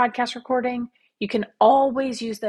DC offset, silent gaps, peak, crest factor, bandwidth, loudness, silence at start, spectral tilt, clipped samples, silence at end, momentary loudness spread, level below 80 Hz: under 0.1%; none; -4 dBFS; 18 dB; 12.5 kHz; -22 LUFS; 0 s; -4.5 dB/octave; under 0.1%; 0 s; 15 LU; -62 dBFS